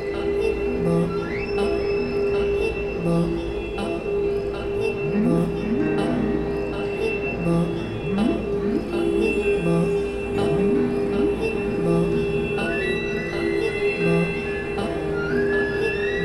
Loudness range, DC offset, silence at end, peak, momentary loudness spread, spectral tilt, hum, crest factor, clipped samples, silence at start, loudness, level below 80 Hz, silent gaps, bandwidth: 2 LU; under 0.1%; 0 s; -8 dBFS; 5 LU; -7.5 dB/octave; none; 14 dB; under 0.1%; 0 s; -23 LUFS; -38 dBFS; none; 12 kHz